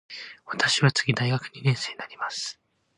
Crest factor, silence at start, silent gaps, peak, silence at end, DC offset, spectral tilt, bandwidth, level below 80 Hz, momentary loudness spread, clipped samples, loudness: 20 dB; 0.1 s; none; -8 dBFS; 0.45 s; under 0.1%; -4 dB/octave; 10.5 kHz; -66 dBFS; 14 LU; under 0.1%; -25 LUFS